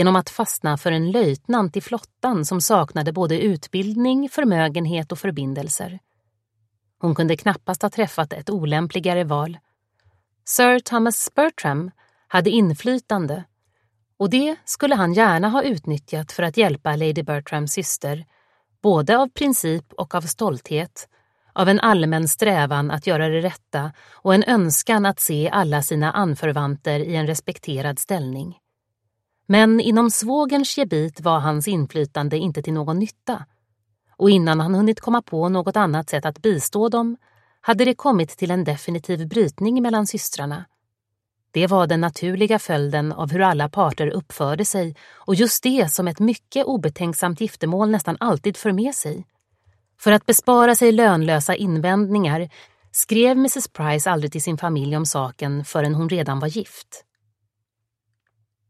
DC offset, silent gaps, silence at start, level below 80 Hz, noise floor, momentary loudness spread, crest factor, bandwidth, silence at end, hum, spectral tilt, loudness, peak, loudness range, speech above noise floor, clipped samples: under 0.1%; none; 0 s; -62 dBFS; -79 dBFS; 10 LU; 20 dB; 15 kHz; 1.7 s; none; -5 dB/octave; -20 LUFS; 0 dBFS; 5 LU; 60 dB; under 0.1%